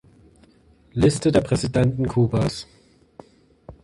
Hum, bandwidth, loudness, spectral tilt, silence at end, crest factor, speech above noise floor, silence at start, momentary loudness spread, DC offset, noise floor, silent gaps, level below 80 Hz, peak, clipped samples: none; 11.5 kHz; -21 LUFS; -6.5 dB/octave; 0.1 s; 18 dB; 35 dB; 0.95 s; 13 LU; under 0.1%; -55 dBFS; none; -44 dBFS; -4 dBFS; under 0.1%